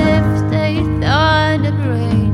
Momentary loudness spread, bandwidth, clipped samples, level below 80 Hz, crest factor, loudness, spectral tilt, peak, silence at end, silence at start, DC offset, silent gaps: 4 LU; 10.5 kHz; under 0.1%; -28 dBFS; 12 dB; -15 LUFS; -7 dB/octave; -2 dBFS; 0 s; 0 s; under 0.1%; none